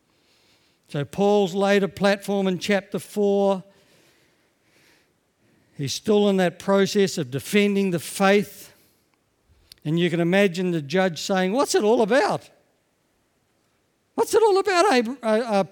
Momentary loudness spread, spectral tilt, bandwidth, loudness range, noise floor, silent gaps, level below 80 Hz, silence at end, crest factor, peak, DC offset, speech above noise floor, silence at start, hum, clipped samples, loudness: 10 LU; -5 dB/octave; 19 kHz; 5 LU; -68 dBFS; none; -66 dBFS; 0.05 s; 18 dB; -4 dBFS; under 0.1%; 47 dB; 0.9 s; none; under 0.1%; -22 LUFS